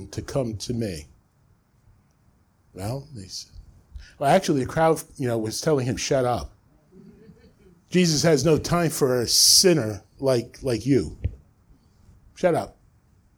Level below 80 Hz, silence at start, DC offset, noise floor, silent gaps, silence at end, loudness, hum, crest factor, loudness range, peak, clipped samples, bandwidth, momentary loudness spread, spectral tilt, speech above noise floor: -46 dBFS; 0 s; under 0.1%; -61 dBFS; none; 0.65 s; -22 LUFS; none; 22 dB; 14 LU; -4 dBFS; under 0.1%; over 20 kHz; 18 LU; -4 dB/octave; 39 dB